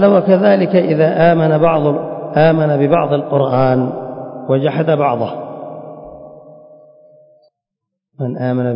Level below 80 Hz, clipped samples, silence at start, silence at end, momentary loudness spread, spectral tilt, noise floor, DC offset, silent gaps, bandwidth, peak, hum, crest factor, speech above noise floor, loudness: -56 dBFS; under 0.1%; 0 s; 0 s; 17 LU; -13 dB/octave; -79 dBFS; under 0.1%; none; 5.4 kHz; 0 dBFS; none; 14 dB; 67 dB; -14 LUFS